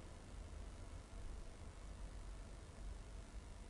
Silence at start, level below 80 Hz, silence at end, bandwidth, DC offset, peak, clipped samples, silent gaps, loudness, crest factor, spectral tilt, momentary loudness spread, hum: 0 s; -54 dBFS; 0 s; 11.5 kHz; under 0.1%; -40 dBFS; under 0.1%; none; -56 LUFS; 12 dB; -5 dB/octave; 2 LU; none